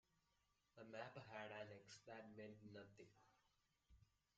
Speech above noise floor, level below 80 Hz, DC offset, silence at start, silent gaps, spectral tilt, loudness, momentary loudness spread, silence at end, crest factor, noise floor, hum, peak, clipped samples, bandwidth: 25 dB; -86 dBFS; under 0.1%; 0.15 s; none; -4 dB/octave; -59 LUFS; 9 LU; 0.3 s; 22 dB; -86 dBFS; none; -40 dBFS; under 0.1%; 7.4 kHz